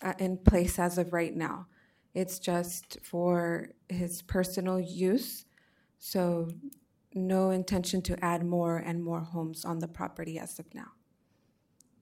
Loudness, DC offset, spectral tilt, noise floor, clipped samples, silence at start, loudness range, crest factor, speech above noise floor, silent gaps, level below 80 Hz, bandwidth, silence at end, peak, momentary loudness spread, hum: -32 LUFS; under 0.1%; -6 dB/octave; -71 dBFS; under 0.1%; 0 s; 3 LU; 28 dB; 40 dB; none; -46 dBFS; 16.5 kHz; 1.1 s; -4 dBFS; 13 LU; none